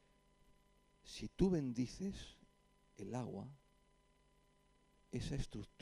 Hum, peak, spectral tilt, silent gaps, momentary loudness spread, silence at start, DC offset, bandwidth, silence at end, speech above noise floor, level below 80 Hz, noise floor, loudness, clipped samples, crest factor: 50 Hz at -70 dBFS; -22 dBFS; -6.5 dB/octave; none; 17 LU; 1.05 s; under 0.1%; 12 kHz; 0.15 s; 32 dB; -58 dBFS; -73 dBFS; -43 LUFS; under 0.1%; 22 dB